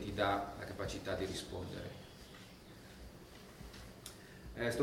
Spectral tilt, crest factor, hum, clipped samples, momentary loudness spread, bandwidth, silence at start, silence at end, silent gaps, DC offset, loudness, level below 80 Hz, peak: -4.5 dB/octave; 22 dB; none; under 0.1%; 18 LU; 17.5 kHz; 0 s; 0 s; none; under 0.1%; -42 LUFS; -58 dBFS; -20 dBFS